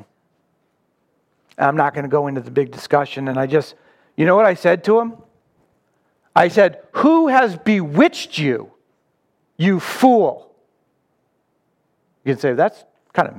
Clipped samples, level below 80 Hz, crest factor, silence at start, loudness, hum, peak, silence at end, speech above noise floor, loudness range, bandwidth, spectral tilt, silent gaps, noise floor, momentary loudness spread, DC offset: under 0.1%; -70 dBFS; 18 dB; 1.6 s; -17 LUFS; none; 0 dBFS; 0.05 s; 51 dB; 4 LU; 16.5 kHz; -6.5 dB/octave; none; -67 dBFS; 9 LU; under 0.1%